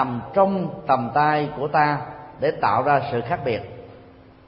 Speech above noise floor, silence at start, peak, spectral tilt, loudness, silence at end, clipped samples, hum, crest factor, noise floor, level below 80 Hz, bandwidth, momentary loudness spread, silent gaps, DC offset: 26 dB; 0 s; -4 dBFS; -11 dB/octave; -22 LUFS; 0.35 s; under 0.1%; none; 18 dB; -47 dBFS; -54 dBFS; 5.6 kHz; 9 LU; none; under 0.1%